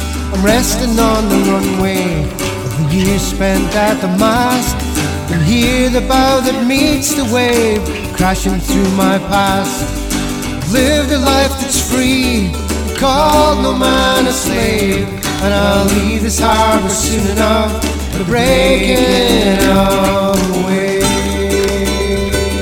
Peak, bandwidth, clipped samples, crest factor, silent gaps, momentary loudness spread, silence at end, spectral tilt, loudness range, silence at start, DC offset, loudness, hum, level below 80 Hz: 0 dBFS; 19 kHz; under 0.1%; 12 dB; none; 7 LU; 0 s; -4.5 dB/octave; 2 LU; 0 s; under 0.1%; -13 LUFS; none; -24 dBFS